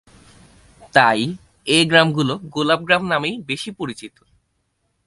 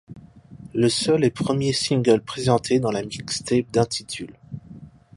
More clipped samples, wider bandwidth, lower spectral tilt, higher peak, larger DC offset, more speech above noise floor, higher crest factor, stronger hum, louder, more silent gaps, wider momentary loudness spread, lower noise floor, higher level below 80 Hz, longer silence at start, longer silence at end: neither; about the same, 11.5 kHz vs 11.5 kHz; about the same, -4.5 dB/octave vs -5 dB/octave; first, 0 dBFS vs -4 dBFS; neither; first, 51 dB vs 22 dB; about the same, 20 dB vs 20 dB; neither; first, -18 LUFS vs -22 LUFS; neither; about the same, 15 LU vs 14 LU; first, -69 dBFS vs -44 dBFS; about the same, -58 dBFS vs -54 dBFS; first, 0.8 s vs 0.1 s; first, 1 s vs 0.3 s